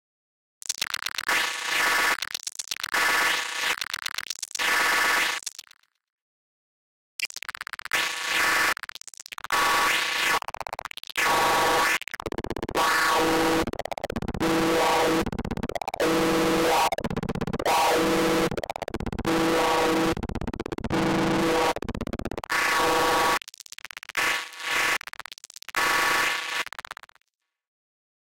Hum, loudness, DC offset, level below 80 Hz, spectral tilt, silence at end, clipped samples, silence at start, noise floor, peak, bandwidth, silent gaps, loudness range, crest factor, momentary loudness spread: none; -24 LUFS; under 0.1%; -46 dBFS; -3 dB/octave; 1.55 s; under 0.1%; 0.7 s; under -90 dBFS; -14 dBFS; 17 kHz; 6.12-6.16 s, 6.22-7.19 s; 3 LU; 12 dB; 13 LU